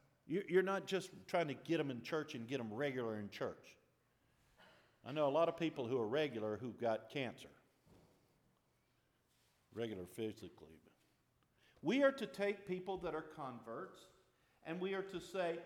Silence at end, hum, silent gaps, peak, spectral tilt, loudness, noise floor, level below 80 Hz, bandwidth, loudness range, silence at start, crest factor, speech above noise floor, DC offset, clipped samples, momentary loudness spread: 0 s; none; none; -22 dBFS; -6 dB/octave; -41 LUFS; -79 dBFS; -80 dBFS; 16.5 kHz; 11 LU; 0.25 s; 20 dB; 38 dB; under 0.1%; under 0.1%; 14 LU